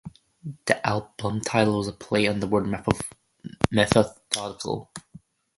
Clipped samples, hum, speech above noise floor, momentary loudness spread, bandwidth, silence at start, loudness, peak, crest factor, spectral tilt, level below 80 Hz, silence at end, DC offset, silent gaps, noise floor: under 0.1%; none; 27 dB; 20 LU; 11.5 kHz; 0.05 s; -25 LUFS; 0 dBFS; 26 dB; -5 dB/octave; -48 dBFS; 0.6 s; under 0.1%; none; -51 dBFS